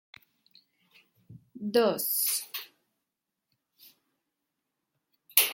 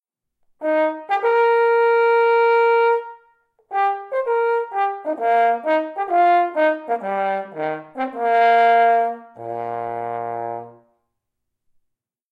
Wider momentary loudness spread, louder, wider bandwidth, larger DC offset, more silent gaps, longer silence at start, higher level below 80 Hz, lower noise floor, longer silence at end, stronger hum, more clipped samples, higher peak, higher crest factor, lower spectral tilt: first, 15 LU vs 12 LU; second, -27 LUFS vs -19 LUFS; first, 17 kHz vs 5.4 kHz; neither; neither; first, 1.3 s vs 0.6 s; about the same, -80 dBFS vs -78 dBFS; first, -86 dBFS vs -78 dBFS; second, 0 s vs 1.6 s; neither; neither; first, -2 dBFS vs -6 dBFS; first, 32 dB vs 14 dB; second, -1.5 dB/octave vs -6 dB/octave